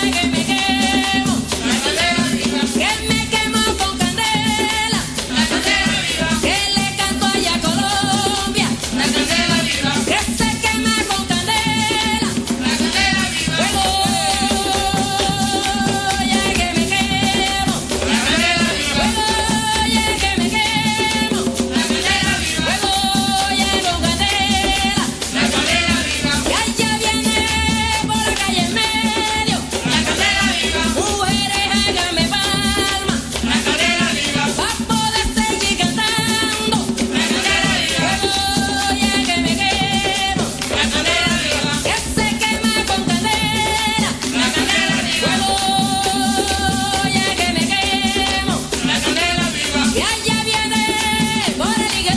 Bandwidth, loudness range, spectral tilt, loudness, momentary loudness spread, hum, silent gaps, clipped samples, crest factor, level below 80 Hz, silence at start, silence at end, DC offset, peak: 11 kHz; 1 LU; -2.5 dB/octave; -16 LUFS; 3 LU; none; none; under 0.1%; 14 dB; -34 dBFS; 0 s; 0 s; under 0.1%; -2 dBFS